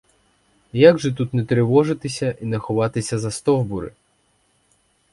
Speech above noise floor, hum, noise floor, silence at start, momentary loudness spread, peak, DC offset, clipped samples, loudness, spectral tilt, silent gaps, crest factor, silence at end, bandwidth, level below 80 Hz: 45 dB; none; -63 dBFS; 0.75 s; 13 LU; 0 dBFS; under 0.1%; under 0.1%; -20 LUFS; -6.5 dB/octave; none; 20 dB; 1.25 s; 11.5 kHz; -52 dBFS